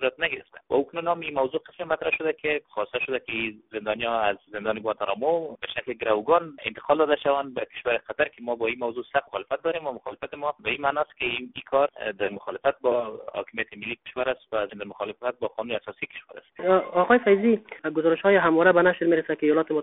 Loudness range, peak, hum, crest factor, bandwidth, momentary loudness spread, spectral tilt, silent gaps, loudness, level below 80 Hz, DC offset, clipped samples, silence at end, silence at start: 8 LU; -4 dBFS; none; 20 dB; 4 kHz; 13 LU; -2.5 dB/octave; none; -26 LUFS; -62 dBFS; under 0.1%; under 0.1%; 0 s; 0 s